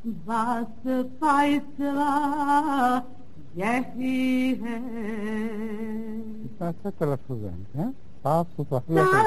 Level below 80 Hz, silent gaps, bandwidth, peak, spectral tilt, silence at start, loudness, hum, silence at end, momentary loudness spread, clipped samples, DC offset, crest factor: -56 dBFS; none; 13 kHz; -8 dBFS; -6.5 dB/octave; 0.05 s; -27 LUFS; none; 0 s; 11 LU; under 0.1%; 2%; 18 dB